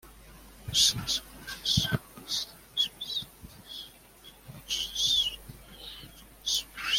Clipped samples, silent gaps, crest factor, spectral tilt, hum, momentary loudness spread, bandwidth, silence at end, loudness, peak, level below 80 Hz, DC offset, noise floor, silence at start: under 0.1%; none; 24 dB; -1.5 dB/octave; none; 24 LU; 16.5 kHz; 0 s; -28 LUFS; -10 dBFS; -52 dBFS; under 0.1%; -53 dBFS; 0.05 s